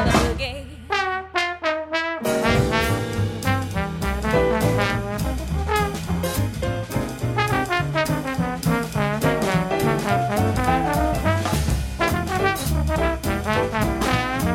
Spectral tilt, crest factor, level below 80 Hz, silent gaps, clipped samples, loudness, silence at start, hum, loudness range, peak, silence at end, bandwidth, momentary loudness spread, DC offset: -5.5 dB/octave; 18 dB; -32 dBFS; none; under 0.1%; -22 LUFS; 0 s; none; 2 LU; -4 dBFS; 0 s; 16.5 kHz; 5 LU; under 0.1%